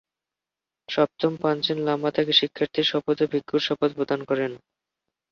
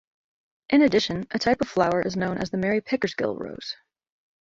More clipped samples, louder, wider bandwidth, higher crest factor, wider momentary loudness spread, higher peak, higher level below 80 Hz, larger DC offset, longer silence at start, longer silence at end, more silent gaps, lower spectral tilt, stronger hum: neither; about the same, -24 LUFS vs -24 LUFS; second, 6.8 kHz vs 7.8 kHz; about the same, 20 dB vs 20 dB; second, 7 LU vs 14 LU; about the same, -4 dBFS vs -6 dBFS; second, -68 dBFS vs -56 dBFS; neither; first, 0.9 s vs 0.7 s; about the same, 0.75 s vs 0.65 s; neither; about the same, -5.5 dB/octave vs -5.5 dB/octave; neither